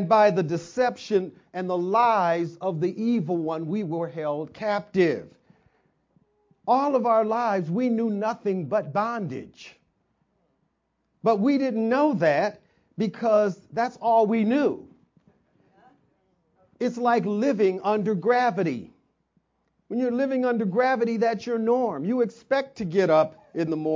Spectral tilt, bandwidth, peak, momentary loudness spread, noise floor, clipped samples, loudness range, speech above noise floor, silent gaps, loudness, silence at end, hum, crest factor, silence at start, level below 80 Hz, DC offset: -7 dB/octave; 7.6 kHz; -8 dBFS; 9 LU; -74 dBFS; under 0.1%; 4 LU; 50 dB; none; -24 LUFS; 0 s; none; 18 dB; 0 s; -70 dBFS; under 0.1%